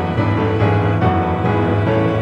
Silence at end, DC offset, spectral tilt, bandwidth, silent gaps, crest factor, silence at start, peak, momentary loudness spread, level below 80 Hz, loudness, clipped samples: 0 s; under 0.1%; -9 dB/octave; 5.8 kHz; none; 12 dB; 0 s; -2 dBFS; 2 LU; -36 dBFS; -16 LUFS; under 0.1%